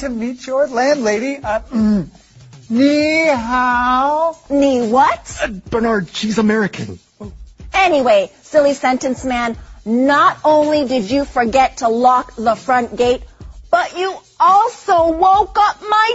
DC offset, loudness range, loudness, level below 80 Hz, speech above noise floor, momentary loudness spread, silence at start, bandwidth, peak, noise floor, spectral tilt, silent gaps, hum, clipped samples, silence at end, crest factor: under 0.1%; 3 LU; -15 LUFS; -40 dBFS; 19 dB; 10 LU; 0 s; 8 kHz; 0 dBFS; -34 dBFS; -5 dB/octave; none; none; under 0.1%; 0 s; 14 dB